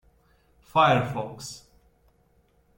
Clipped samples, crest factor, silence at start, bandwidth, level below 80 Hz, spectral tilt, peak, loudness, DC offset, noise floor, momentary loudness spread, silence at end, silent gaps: under 0.1%; 22 dB; 0.75 s; 16.5 kHz; -60 dBFS; -5 dB/octave; -6 dBFS; -24 LUFS; under 0.1%; -64 dBFS; 20 LU; 1.2 s; none